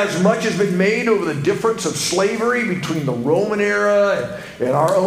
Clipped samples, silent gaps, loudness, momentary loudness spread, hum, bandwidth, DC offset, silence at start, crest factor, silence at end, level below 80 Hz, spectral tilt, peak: under 0.1%; none; -18 LUFS; 5 LU; none; 16 kHz; under 0.1%; 0 s; 14 dB; 0 s; -54 dBFS; -5 dB/octave; -2 dBFS